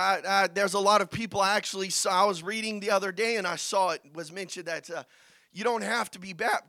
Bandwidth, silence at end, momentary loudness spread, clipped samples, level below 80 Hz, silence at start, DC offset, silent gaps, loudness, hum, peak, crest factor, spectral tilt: 17.5 kHz; 0.1 s; 13 LU; under 0.1%; -70 dBFS; 0 s; under 0.1%; none; -27 LUFS; none; -8 dBFS; 20 dB; -2.5 dB/octave